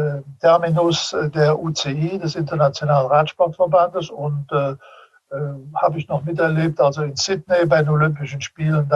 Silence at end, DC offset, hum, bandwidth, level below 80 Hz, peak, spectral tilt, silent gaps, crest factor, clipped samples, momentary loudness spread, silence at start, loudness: 0 s; under 0.1%; none; 7.8 kHz; -58 dBFS; -2 dBFS; -6 dB/octave; none; 16 dB; under 0.1%; 10 LU; 0 s; -19 LUFS